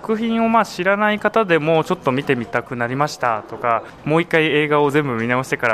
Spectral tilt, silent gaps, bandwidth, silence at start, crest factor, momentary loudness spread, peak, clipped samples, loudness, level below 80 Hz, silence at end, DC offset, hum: -6 dB/octave; none; 14 kHz; 0 s; 16 dB; 6 LU; -2 dBFS; under 0.1%; -18 LUFS; -54 dBFS; 0 s; under 0.1%; none